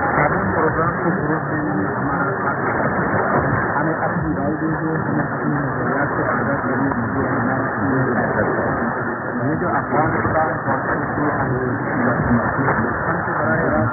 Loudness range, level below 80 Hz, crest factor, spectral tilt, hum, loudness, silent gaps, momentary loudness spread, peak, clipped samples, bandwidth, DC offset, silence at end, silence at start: 1 LU; -42 dBFS; 16 dB; -16 dB/octave; none; -19 LUFS; none; 3 LU; -4 dBFS; under 0.1%; 2.5 kHz; under 0.1%; 0 s; 0 s